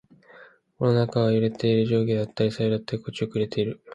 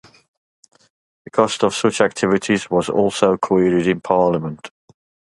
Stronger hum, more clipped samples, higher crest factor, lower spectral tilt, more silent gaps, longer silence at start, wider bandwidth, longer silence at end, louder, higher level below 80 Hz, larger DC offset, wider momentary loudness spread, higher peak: neither; neither; about the same, 16 dB vs 18 dB; first, -8 dB/octave vs -5 dB/octave; neither; second, 0.4 s vs 1.35 s; second, 9.2 kHz vs 11.5 kHz; second, 0 s vs 0.65 s; second, -24 LUFS vs -18 LUFS; second, -60 dBFS vs -54 dBFS; neither; about the same, 7 LU vs 8 LU; second, -8 dBFS vs 0 dBFS